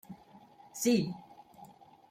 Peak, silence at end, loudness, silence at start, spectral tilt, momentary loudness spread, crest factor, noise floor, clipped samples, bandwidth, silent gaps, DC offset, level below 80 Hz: -16 dBFS; 0.45 s; -31 LUFS; 0.1 s; -5 dB/octave; 26 LU; 20 dB; -58 dBFS; under 0.1%; 16 kHz; none; under 0.1%; -74 dBFS